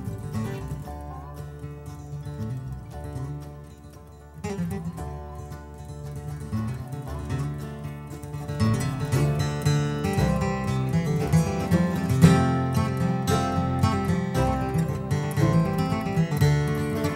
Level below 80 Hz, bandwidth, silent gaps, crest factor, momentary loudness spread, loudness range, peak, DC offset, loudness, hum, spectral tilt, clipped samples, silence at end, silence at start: -40 dBFS; 16 kHz; none; 22 dB; 16 LU; 13 LU; -4 dBFS; under 0.1%; -26 LUFS; none; -7 dB/octave; under 0.1%; 0 s; 0 s